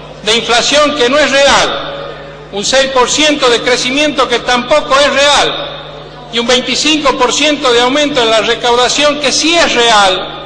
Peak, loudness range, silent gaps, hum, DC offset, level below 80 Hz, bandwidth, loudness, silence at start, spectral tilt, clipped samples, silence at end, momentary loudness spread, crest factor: 0 dBFS; 2 LU; none; none; under 0.1%; -38 dBFS; 10.5 kHz; -9 LUFS; 0 s; -1.5 dB/octave; under 0.1%; 0 s; 12 LU; 10 dB